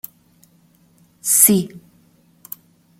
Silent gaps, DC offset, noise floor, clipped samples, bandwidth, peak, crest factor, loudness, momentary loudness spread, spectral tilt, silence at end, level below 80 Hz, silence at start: none; under 0.1%; -55 dBFS; under 0.1%; 17 kHz; 0 dBFS; 22 dB; -14 LUFS; 25 LU; -3.5 dB/octave; 1.2 s; -64 dBFS; 1.25 s